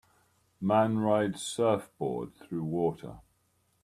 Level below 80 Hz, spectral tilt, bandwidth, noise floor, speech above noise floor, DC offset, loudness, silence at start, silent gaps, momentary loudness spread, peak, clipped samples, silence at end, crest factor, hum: -66 dBFS; -6 dB/octave; 15 kHz; -72 dBFS; 43 dB; under 0.1%; -30 LUFS; 0.6 s; none; 12 LU; -12 dBFS; under 0.1%; 0.65 s; 18 dB; none